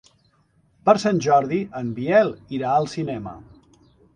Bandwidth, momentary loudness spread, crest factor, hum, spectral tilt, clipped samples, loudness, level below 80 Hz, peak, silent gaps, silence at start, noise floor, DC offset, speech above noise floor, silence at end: 9.8 kHz; 11 LU; 22 dB; none; -6 dB/octave; under 0.1%; -21 LUFS; -58 dBFS; 0 dBFS; none; 0.85 s; -62 dBFS; under 0.1%; 41 dB; 0.75 s